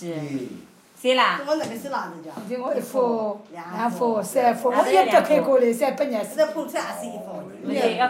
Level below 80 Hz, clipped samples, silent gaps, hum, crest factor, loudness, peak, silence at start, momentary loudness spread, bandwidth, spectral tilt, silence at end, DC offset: -76 dBFS; under 0.1%; none; none; 18 dB; -22 LUFS; -4 dBFS; 0 s; 16 LU; 16 kHz; -4.5 dB/octave; 0 s; under 0.1%